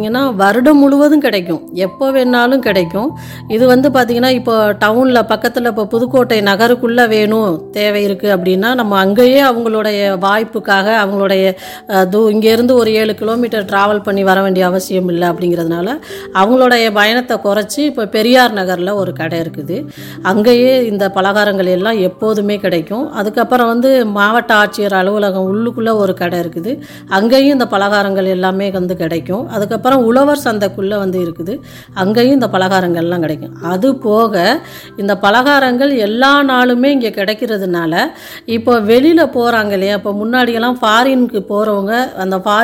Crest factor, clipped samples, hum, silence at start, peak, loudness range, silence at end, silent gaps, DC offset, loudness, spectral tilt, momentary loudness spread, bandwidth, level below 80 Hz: 12 dB; under 0.1%; none; 0 s; 0 dBFS; 2 LU; 0 s; none; under 0.1%; -12 LUFS; -5.5 dB/octave; 9 LU; 17 kHz; -52 dBFS